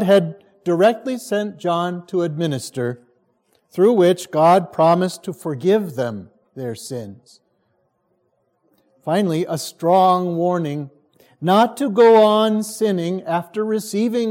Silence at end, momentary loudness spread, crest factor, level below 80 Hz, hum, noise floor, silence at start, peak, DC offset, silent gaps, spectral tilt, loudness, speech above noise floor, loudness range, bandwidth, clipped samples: 0 s; 15 LU; 16 dB; -72 dBFS; none; -67 dBFS; 0 s; -2 dBFS; under 0.1%; none; -6 dB/octave; -18 LUFS; 49 dB; 10 LU; 17 kHz; under 0.1%